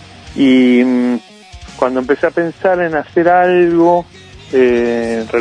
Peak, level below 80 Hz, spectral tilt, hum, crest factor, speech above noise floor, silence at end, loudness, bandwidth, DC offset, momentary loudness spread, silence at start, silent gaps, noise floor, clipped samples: 0 dBFS; -44 dBFS; -6.5 dB/octave; none; 12 dB; 22 dB; 0 s; -13 LUFS; 9.8 kHz; under 0.1%; 8 LU; 0.25 s; none; -34 dBFS; under 0.1%